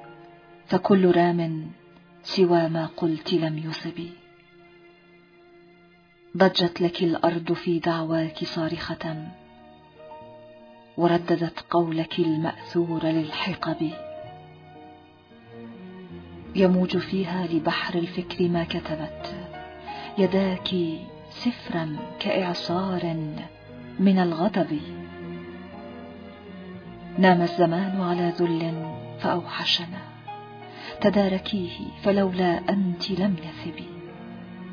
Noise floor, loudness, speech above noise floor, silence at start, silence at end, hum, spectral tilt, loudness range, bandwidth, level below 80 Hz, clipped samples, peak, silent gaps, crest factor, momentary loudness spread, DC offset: -55 dBFS; -25 LUFS; 31 dB; 0 s; 0 s; none; -7.5 dB/octave; 5 LU; 5.4 kHz; -58 dBFS; under 0.1%; -4 dBFS; none; 22 dB; 20 LU; under 0.1%